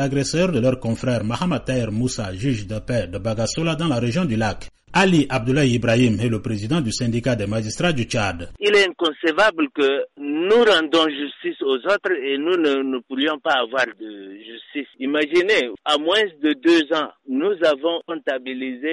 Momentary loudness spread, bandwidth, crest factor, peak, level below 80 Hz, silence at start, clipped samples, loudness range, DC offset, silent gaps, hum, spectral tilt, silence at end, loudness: 9 LU; 11.5 kHz; 14 dB; -6 dBFS; -46 dBFS; 0 s; under 0.1%; 4 LU; under 0.1%; none; none; -5 dB/octave; 0 s; -20 LUFS